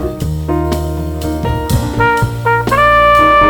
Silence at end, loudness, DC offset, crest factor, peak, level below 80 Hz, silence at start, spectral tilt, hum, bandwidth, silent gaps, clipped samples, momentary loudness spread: 0 s; -13 LUFS; under 0.1%; 12 dB; 0 dBFS; -24 dBFS; 0 s; -6 dB/octave; none; over 20 kHz; none; under 0.1%; 12 LU